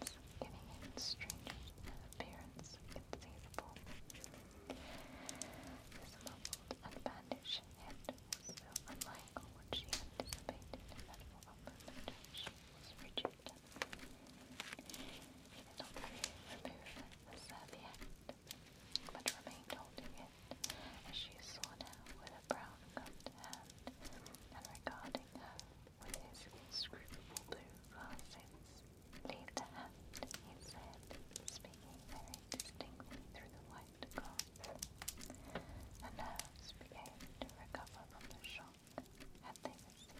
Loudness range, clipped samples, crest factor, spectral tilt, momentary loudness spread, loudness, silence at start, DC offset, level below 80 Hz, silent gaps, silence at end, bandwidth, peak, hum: 5 LU; under 0.1%; 34 dB; -2.5 dB/octave; 11 LU; -51 LUFS; 0 s; under 0.1%; -62 dBFS; none; 0 s; 16.5 kHz; -18 dBFS; none